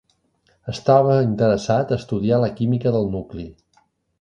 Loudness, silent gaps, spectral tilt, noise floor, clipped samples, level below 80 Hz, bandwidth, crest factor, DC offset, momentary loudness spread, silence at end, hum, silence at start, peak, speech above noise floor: -19 LUFS; none; -8 dB/octave; -63 dBFS; under 0.1%; -48 dBFS; 8.8 kHz; 18 dB; under 0.1%; 18 LU; 0.7 s; none; 0.65 s; -2 dBFS; 45 dB